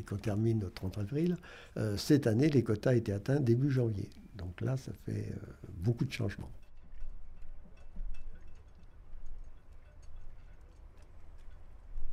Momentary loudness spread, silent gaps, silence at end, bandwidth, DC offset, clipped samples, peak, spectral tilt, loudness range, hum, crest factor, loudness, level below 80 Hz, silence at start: 24 LU; none; 0 s; 15 kHz; under 0.1%; under 0.1%; -16 dBFS; -7.5 dB/octave; 23 LU; none; 18 dB; -33 LUFS; -48 dBFS; 0 s